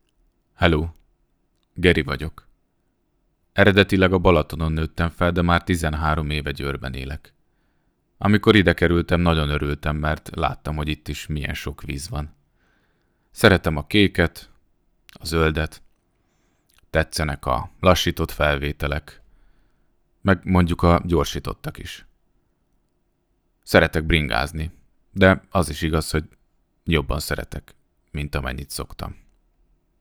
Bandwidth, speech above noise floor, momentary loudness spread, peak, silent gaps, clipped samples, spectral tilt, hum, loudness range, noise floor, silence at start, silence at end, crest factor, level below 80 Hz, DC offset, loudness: over 20 kHz; 47 dB; 16 LU; 0 dBFS; none; under 0.1%; -6 dB/octave; none; 6 LU; -68 dBFS; 0.6 s; 0.9 s; 22 dB; -34 dBFS; under 0.1%; -21 LUFS